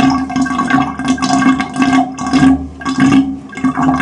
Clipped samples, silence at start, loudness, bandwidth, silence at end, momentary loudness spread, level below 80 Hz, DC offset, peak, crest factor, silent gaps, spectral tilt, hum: under 0.1%; 0 s; -13 LUFS; 10.5 kHz; 0 s; 6 LU; -36 dBFS; under 0.1%; 0 dBFS; 12 dB; none; -5 dB/octave; none